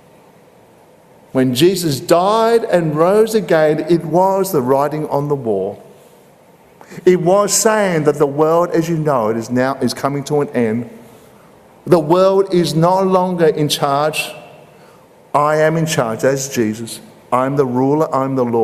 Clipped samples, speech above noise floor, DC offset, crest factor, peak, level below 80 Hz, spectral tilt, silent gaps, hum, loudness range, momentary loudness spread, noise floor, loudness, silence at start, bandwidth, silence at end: under 0.1%; 32 dB; under 0.1%; 16 dB; 0 dBFS; -56 dBFS; -5 dB/octave; none; none; 4 LU; 8 LU; -46 dBFS; -15 LUFS; 1.35 s; 15.5 kHz; 0 s